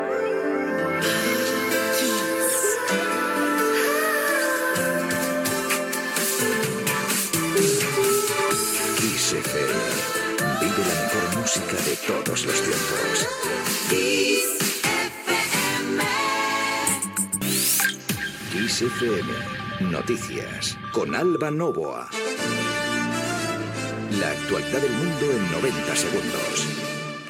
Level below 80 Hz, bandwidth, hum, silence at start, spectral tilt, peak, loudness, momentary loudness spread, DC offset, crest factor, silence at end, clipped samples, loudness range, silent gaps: -56 dBFS; 19 kHz; none; 0 s; -3 dB/octave; -6 dBFS; -23 LUFS; 6 LU; under 0.1%; 18 dB; 0 s; under 0.1%; 4 LU; none